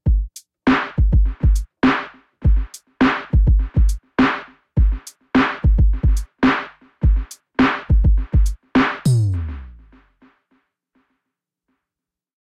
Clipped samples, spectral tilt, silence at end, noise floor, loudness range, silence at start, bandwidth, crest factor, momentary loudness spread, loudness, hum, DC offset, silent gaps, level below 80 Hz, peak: under 0.1%; -7 dB/octave; 2.8 s; -87 dBFS; 5 LU; 0.05 s; 11.5 kHz; 12 dB; 9 LU; -19 LUFS; none; under 0.1%; none; -20 dBFS; -6 dBFS